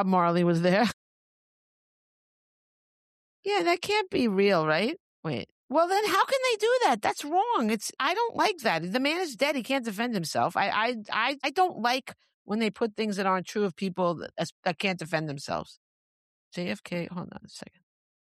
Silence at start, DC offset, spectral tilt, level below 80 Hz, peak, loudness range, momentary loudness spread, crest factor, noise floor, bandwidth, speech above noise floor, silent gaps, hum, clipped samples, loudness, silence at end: 0 s; under 0.1%; -4.5 dB/octave; -70 dBFS; -12 dBFS; 7 LU; 11 LU; 16 dB; under -90 dBFS; 14 kHz; over 63 dB; 0.93-3.43 s, 5.00-5.23 s, 5.51-5.69 s, 12.34-12.45 s, 14.52-14.63 s, 15.77-16.51 s; none; under 0.1%; -27 LUFS; 0.7 s